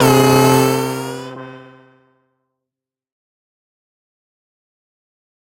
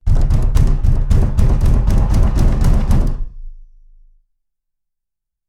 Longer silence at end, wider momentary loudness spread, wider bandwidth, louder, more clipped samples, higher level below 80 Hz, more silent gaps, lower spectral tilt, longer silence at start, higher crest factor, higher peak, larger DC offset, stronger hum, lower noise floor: first, 3.95 s vs 1.85 s; first, 22 LU vs 3 LU; first, 16.5 kHz vs 11 kHz; first, -13 LUFS vs -17 LUFS; neither; second, -52 dBFS vs -14 dBFS; neither; second, -5 dB/octave vs -8 dB/octave; about the same, 0 s vs 0.05 s; first, 18 dB vs 12 dB; about the same, 0 dBFS vs 0 dBFS; neither; neither; first, -86 dBFS vs -80 dBFS